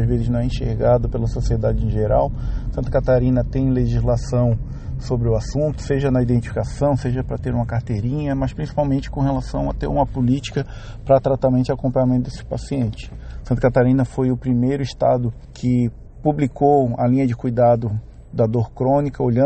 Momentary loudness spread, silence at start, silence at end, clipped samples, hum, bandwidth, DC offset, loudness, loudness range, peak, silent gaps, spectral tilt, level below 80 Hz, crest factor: 9 LU; 0 s; 0 s; under 0.1%; none; 8.6 kHz; under 0.1%; -20 LUFS; 3 LU; -2 dBFS; none; -8.5 dB/octave; -30 dBFS; 18 dB